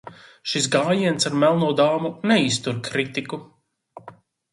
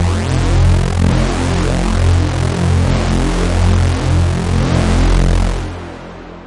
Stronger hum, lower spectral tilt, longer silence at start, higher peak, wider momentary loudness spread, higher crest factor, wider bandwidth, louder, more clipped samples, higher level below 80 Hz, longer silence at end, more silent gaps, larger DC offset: neither; second, -4.5 dB/octave vs -6 dB/octave; about the same, 0.05 s vs 0 s; second, -4 dBFS vs 0 dBFS; first, 10 LU vs 6 LU; first, 18 dB vs 12 dB; about the same, 11.5 kHz vs 11.5 kHz; second, -21 LUFS vs -15 LUFS; neither; second, -64 dBFS vs -18 dBFS; first, 0.4 s vs 0 s; neither; neither